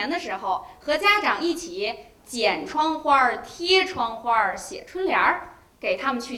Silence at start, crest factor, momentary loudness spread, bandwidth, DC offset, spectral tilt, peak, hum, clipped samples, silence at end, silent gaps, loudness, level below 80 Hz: 0 s; 18 dB; 11 LU; 15.5 kHz; under 0.1%; -2.5 dB/octave; -6 dBFS; none; under 0.1%; 0 s; none; -23 LUFS; -58 dBFS